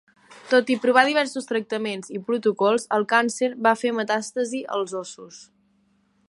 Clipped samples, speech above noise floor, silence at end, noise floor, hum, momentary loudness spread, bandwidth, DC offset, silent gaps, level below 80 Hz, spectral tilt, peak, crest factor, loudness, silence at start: under 0.1%; 42 dB; 0.85 s; -65 dBFS; none; 12 LU; 11.5 kHz; under 0.1%; none; -76 dBFS; -3.5 dB/octave; -2 dBFS; 22 dB; -23 LUFS; 0.3 s